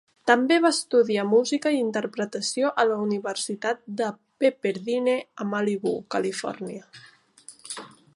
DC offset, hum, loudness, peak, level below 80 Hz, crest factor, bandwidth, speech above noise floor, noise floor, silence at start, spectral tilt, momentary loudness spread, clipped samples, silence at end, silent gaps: under 0.1%; none; -25 LUFS; -4 dBFS; -76 dBFS; 22 dB; 11.5 kHz; 27 dB; -51 dBFS; 0.25 s; -4 dB/octave; 15 LU; under 0.1%; 0.3 s; none